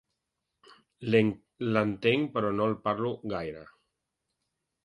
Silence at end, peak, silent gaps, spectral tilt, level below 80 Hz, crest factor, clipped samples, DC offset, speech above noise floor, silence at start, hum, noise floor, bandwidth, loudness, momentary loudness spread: 1.2 s; -10 dBFS; none; -8 dB/octave; -64 dBFS; 22 dB; under 0.1%; under 0.1%; 56 dB; 1 s; none; -84 dBFS; 9.6 kHz; -29 LUFS; 11 LU